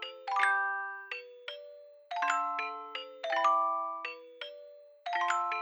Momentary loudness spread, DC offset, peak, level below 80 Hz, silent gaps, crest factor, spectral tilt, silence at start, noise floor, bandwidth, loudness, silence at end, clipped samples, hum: 17 LU; under 0.1%; -14 dBFS; under -90 dBFS; none; 20 dB; 2.5 dB/octave; 0 s; -53 dBFS; over 20 kHz; -32 LUFS; 0 s; under 0.1%; none